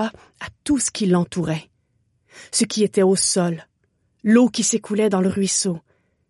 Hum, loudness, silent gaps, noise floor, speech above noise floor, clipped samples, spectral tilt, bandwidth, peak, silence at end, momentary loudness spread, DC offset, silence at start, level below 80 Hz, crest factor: none; -20 LUFS; none; -67 dBFS; 48 dB; under 0.1%; -4.5 dB/octave; 11.5 kHz; -4 dBFS; 0.5 s; 14 LU; under 0.1%; 0 s; -56 dBFS; 18 dB